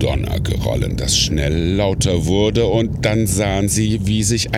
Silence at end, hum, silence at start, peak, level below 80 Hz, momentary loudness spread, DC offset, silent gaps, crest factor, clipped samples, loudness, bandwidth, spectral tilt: 0 s; none; 0 s; -2 dBFS; -28 dBFS; 4 LU; under 0.1%; none; 14 dB; under 0.1%; -17 LUFS; 16 kHz; -4.5 dB/octave